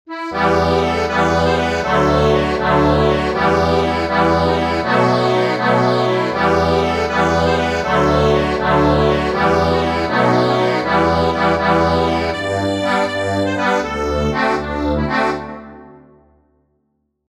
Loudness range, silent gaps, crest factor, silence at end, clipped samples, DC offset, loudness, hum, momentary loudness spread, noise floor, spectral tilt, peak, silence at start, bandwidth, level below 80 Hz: 3 LU; none; 14 dB; 1.3 s; under 0.1%; under 0.1%; -16 LUFS; none; 4 LU; -68 dBFS; -6 dB/octave; -2 dBFS; 0.1 s; 13.5 kHz; -32 dBFS